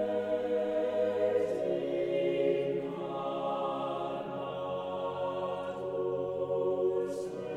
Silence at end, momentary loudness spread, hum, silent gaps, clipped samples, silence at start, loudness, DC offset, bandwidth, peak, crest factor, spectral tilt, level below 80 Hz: 0 s; 6 LU; none; none; under 0.1%; 0 s; -33 LUFS; under 0.1%; 11 kHz; -18 dBFS; 14 dB; -7 dB/octave; -70 dBFS